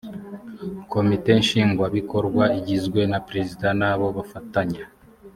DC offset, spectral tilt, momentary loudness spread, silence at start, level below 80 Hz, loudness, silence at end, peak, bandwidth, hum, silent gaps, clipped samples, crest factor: under 0.1%; -6.5 dB/octave; 16 LU; 0.05 s; -52 dBFS; -22 LUFS; 0.05 s; -4 dBFS; 15 kHz; none; none; under 0.1%; 20 dB